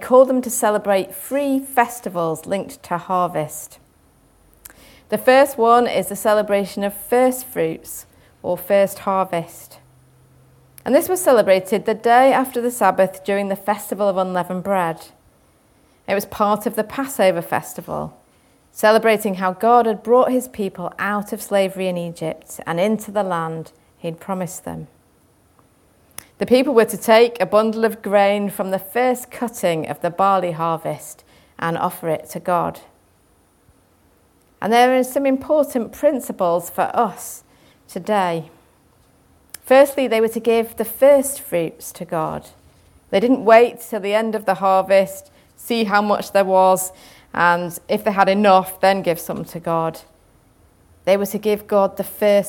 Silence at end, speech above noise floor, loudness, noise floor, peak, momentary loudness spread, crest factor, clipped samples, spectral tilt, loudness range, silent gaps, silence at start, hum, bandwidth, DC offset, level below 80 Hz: 0 s; 39 dB; -18 LUFS; -57 dBFS; 0 dBFS; 15 LU; 20 dB; under 0.1%; -4.5 dB/octave; 7 LU; none; 0 s; none; 17.5 kHz; under 0.1%; -60 dBFS